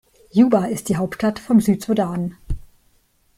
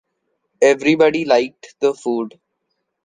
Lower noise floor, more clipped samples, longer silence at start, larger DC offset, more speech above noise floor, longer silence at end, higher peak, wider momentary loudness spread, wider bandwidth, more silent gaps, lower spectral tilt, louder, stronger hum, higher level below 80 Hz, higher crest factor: second, -60 dBFS vs -74 dBFS; neither; second, 0.35 s vs 0.6 s; neither; second, 42 dB vs 57 dB; about the same, 0.8 s vs 0.75 s; about the same, -4 dBFS vs -2 dBFS; first, 15 LU vs 11 LU; first, 15 kHz vs 9.6 kHz; neither; first, -7 dB/octave vs -4.5 dB/octave; about the same, -19 LUFS vs -17 LUFS; neither; first, -38 dBFS vs -64 dBFS; about the same, 16 dB vs 16 dB